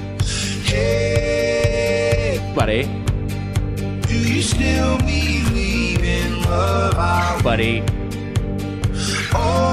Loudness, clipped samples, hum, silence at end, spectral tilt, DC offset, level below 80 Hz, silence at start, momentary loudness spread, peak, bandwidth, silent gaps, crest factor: -19 LUFS; under 0.1%; none; 0 s; -5 dB/octave; under 0.1%; -26 dBFS; 0 s; 6 LU; -2 dBFS; 15 kHz; none; 16 dB